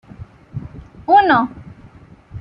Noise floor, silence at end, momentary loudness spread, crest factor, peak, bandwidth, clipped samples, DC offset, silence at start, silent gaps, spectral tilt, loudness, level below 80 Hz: -44 dBFS; 0 s; 24 LU; 18 dB; -2 dBFS; 5.4 kHz; under 0.1%; under 0.1%; 0.2 s; none; -8 dB/octave; -14 LUFS; -46 dBFS